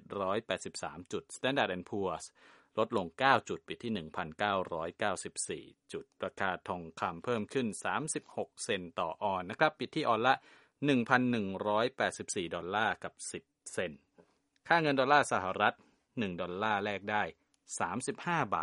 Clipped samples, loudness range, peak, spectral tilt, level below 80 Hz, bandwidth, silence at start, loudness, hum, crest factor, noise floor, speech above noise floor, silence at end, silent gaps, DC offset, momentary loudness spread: under 0.1%; 5 LU; -10 dBFS; -4 dB/octave; -72 dBFS; 11.5 kHz; 0.1 s; -34 LUFS; none; 24 dB; -67 dBFS; 33 dB; 0 s; none; under 0.1%; 13 LU